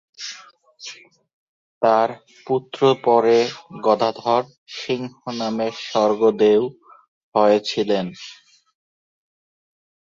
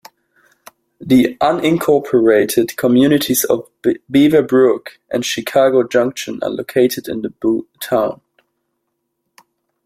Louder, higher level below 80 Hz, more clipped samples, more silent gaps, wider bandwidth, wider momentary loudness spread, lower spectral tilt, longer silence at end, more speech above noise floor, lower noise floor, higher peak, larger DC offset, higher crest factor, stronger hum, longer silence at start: second, -20 LUFS vs -15 LUFS; second, -68 dBFS vs -54 dBFS; neither; first, 1.33-1.81 s, 4.58-4.66 s, 7.08-7.32 s vs none; second, 7.6 kHz vs 16.5 kHz; first, 20 LU vs 11 LU; about the same, -5 dB/octave vs -5 dB/octave; about the same, 1.75 s vs 1.7 s; second, 27 dB vs 58 dB; second, -46 dBFS vs -72 dBFS; about the same, -2 dBFS vs -2 dBFS; neither; first, 20 dB vs 14 dB; neither; second, 0.2 s vs 1 s